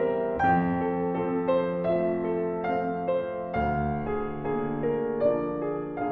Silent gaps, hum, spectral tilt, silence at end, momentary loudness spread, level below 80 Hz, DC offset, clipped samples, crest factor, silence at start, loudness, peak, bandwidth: none; none; -10 dB/octave; 0 s; 6 LU; -48 dBFS; under 0.1%; under 0.1%; 14 dB; 0 s; -28 LUFS; -12 dBFS; 5 kHz